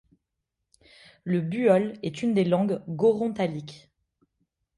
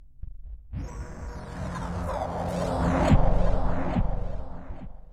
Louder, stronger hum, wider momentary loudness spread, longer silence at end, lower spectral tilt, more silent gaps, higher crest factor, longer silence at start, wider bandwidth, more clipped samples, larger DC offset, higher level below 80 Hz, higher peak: first, -25 LUFS vs -29 LUFS; neither; second, 12 LU vs 21 LU; first, 1 s vs 0 s; about the same, -7.5 dB/octave vs -7.5 dB/octave; neither; about the same, 20 dB vs 18 dB; first, 1.25 s vs 0 s; first, 11 kHz vs 9.8 kHz; neither; neither; second, -66 dBFS vs -30 dBFS; about the same, -8 dBFS vs -8 dBFS